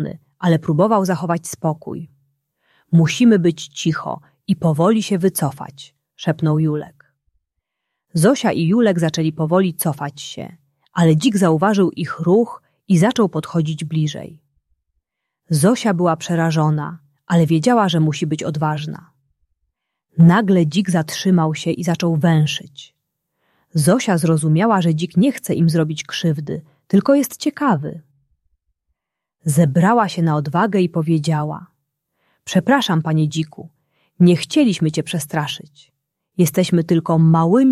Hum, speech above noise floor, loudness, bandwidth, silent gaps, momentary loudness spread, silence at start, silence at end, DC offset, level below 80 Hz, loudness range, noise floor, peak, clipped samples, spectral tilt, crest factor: none; 62 dB; -17 LUFS; 14 kHz; none; 12 LU; 0 s; 0 s; under 0.1%; -58 dBFS; 3 LU; -78 dBFS; -2 dBFS; under 0.1%; -6.5 dB/octave; 16 dB